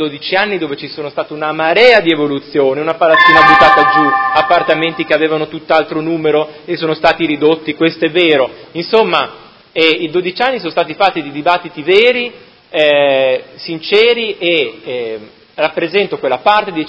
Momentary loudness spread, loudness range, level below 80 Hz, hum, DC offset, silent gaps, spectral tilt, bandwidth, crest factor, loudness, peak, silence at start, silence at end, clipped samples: 14 LU; 5 LU; -50 dBFS; none; under 0.1%; none; -5.5 dB/octave; 8 kHz; 12 dB; -12 LUFS; 0 dBFS; 0 s; 0 s; 0.3%